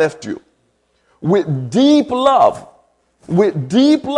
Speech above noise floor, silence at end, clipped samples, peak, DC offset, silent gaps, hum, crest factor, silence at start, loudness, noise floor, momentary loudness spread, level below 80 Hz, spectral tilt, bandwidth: 48 dB; 0 s; under 0.1%; 0 dBFS; under 0.1%; none; none; 14 dB; 0 s; -14 LUFS; -62 dBFS; 17 LU; -56 dBFS; -6.5 dB/octave; 10.5 kHz